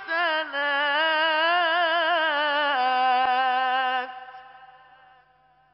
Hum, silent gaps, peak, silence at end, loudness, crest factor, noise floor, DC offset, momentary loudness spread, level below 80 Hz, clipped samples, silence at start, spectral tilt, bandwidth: none; none; -12 dBFS; 1.1 s; -22 LUFS; 12 dB; -60 dBFS; under 0.1%; 5 LU; -74 dBFS; under 0.1%; 0 s; 4 dB/octave; 5.8 kHz